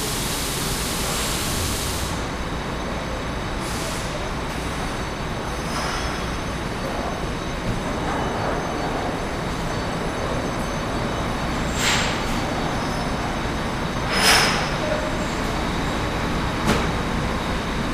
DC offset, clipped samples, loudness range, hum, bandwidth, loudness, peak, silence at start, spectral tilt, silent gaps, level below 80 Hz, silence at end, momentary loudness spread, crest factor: under 0.1%; under 0.1%; 6 LU; none; 15.5 kHz; -24 LUFS; -4 dBFS; 0 s; -4 dB/octave; none; -32 dBFS; 0 s; 7 LU; 20 dB